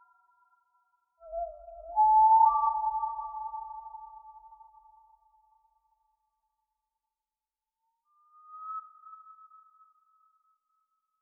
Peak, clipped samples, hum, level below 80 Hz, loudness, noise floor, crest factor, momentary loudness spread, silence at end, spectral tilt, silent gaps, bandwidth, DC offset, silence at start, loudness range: -12 dBFS; under 0.1%; none; -66 dBFS; -27 LUFS; under -90 dBFS; 20 dB; 27 LU; 2.05 s; 14 dB/octave; none; 1.5 kHz; under 0.1%; 1.25 s; 22 LU